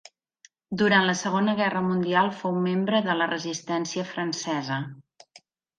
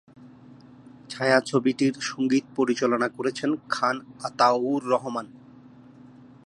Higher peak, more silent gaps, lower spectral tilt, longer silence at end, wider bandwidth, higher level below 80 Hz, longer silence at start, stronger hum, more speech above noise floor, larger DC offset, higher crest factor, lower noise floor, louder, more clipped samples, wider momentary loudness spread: about the same, -6 dBFS vs -4 dBFS; neither; about the same, -4.5 dB/octave vs -5 dB/octave; second, 0.8 s vs 1.1 s; second, 9.2 kHz vs 11 kHz; about the same, -70 dBFS vs -72 dBFS; first, 0.7 s vs 0.2 s; neither; first, 35 dB vs 25 dB; neither; about the same, 20 dB vs 22 dB; first, -60 dBFS vs -49 dBFS; about the same, -25 LUFS vs -25 LUFS; neither; about the same, 9 LU vs 11 LU